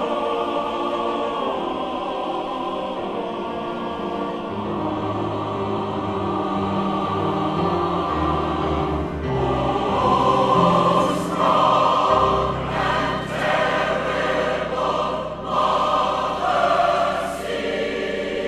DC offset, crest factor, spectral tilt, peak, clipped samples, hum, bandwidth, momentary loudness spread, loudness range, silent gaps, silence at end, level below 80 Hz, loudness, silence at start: under 0.1%; 18 dB; -6 dB/octave; -4 dBFS; under 0.1%; none; 14 kHz; 9 LU; 8 LU; none; 0 s; -42 dBFS; -22 LUFS; 0 s